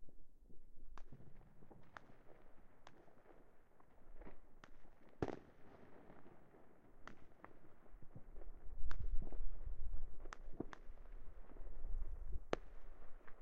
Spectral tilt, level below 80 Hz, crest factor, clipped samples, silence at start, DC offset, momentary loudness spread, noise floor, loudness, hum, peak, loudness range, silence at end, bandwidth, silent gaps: -6 dB/octave; -50 dBFS; 24 dB; under 0.1%; 0 s; under 0.1%; 20 LU; -62 dBFS; -55 LUFS; none; -18 dBFS; 12 LU; 0 s; 4.7 kHz; none